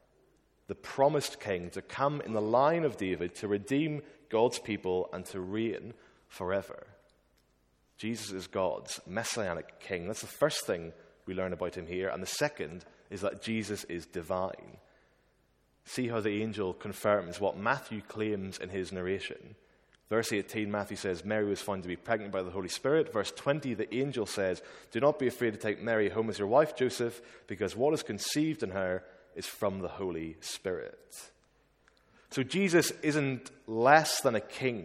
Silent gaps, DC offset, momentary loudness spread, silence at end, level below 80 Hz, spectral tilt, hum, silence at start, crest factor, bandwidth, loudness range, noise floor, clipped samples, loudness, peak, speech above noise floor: none; under 0.1%; 13 LU; 0 s; -68 dBFS; -4.5 dB/octave; none; 0.7 s; 26 dB; 16.5 kHz; 7 LU; -70 dBFS; under 0.1%; -33 LUFS; -6 dBFS; 38 dB